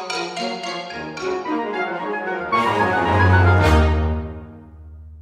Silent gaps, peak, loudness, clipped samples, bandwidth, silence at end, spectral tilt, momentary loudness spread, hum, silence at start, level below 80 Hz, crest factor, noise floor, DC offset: none; -4 dBFS; -20 LUFS; under 0.1%; 11 kHz; 0 s; -6.5 dB/octave; 13 LU; none; 0 s; -28 dBFS; 16 dB; -40 dBFS; under 0.1%